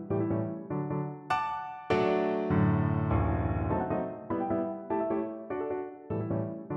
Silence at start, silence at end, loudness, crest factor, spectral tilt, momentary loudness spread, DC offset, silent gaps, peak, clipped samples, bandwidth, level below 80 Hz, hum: 0 s; 0 s; -31 LUFS; 16 dB; -9 dB/octave; 8 LU; under 0.1%; none; -14 dBFS; under 0.1%; 7.8 kHz; -46 dBFS; none